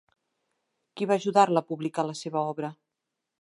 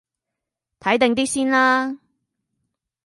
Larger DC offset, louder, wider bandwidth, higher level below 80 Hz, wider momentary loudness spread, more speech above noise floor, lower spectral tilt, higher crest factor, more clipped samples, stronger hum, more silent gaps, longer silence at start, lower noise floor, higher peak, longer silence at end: neither; second, -27 LUFS vs -19 LUFS; about the same, 11.5 kHz vs 11.5 kHz; second, -82 dBFS vs -62 dBFS; about the same, 12 LU vs 12 LU; second, 59 dB vs 65 dB; first, -5.5 dB/octave vs -3 dB/octave; about the same, 22 dB vs 20 dB; neither; neither; neither; about the same, 0.95 s vs 0.85 s; about the same, -85 dBFS vs -84 dBFS; second, -6 dBFS vs -2 dBFS; second, 0.7 s vs 1.1 s